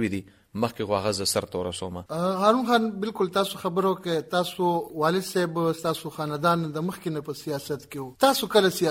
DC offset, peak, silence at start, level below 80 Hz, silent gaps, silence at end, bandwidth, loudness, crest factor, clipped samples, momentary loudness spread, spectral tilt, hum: under 0.1%; -6 dBFS; 0 s; -62 dBFS; none; 0 s; 17 kHz; -26 LUFS; 20 dB; under 0.1%; 11 LU; -4.5 dB/octave; none